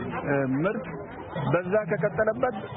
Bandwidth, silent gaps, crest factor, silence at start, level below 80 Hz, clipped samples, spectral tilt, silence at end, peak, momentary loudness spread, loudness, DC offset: 3.9 kHz; none; 16 dB; 0 s; -56 dBFS; under 0.1%; -11.5 dB/octave; 0 s; -10 dBFS; 10 LU; -27 LUFS; under 0.1%